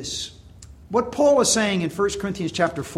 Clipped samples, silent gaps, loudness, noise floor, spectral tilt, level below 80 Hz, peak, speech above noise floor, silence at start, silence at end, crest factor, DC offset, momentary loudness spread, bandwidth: under 0.1%; none; -21 LUFS; -44 dBFS; -3.5 dB/octave; -48 dBFS; -6 dBFS; 23 dB; 0 s; 0 s; 16 dB; under 0.1%; 11 LU; 16 kHz